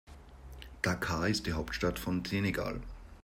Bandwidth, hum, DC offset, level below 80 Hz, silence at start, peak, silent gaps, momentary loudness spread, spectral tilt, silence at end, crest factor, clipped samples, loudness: 16 kHz; none; under 0.1%; -48 dBFS; 0.05 s; -14 dBFS; none; 19 LU; -5 dB/octave; 0.05 s; 20 dB; under 0.1%; -34 LUFS